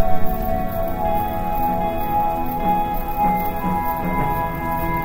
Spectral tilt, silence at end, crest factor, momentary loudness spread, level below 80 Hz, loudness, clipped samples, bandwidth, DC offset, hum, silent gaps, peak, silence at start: -7.5 dB/octave; 0 s; 14 dB; 3 LU; -28 dBFS; -22 LUFS; under 0.1%; 16.5 kHz; under 0.1%; none; none; -4 dBFS; 0 s